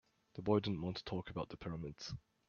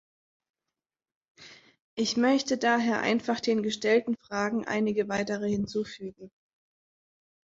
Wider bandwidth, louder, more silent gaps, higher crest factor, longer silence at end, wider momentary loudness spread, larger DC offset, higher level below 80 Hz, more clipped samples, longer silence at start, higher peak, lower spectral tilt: about the same, 7.2 kHz vs 7.8 kHz; second, -41 LUFS vs -28 LUFS; second, none vs 1.80-1.97 s; about the same, 22 dB vs 18 dB; second, 0.3 s vs 1.2 s; first, 13 LU vs 8 LU; neither; about the same, -64 dBFS vs -66 dBFS; neither; second, 0.35 s vs 1.4 s; second, -20 dBFS vs -12 dBFS; first, -6 dB/octave vs -4.5 dB/octave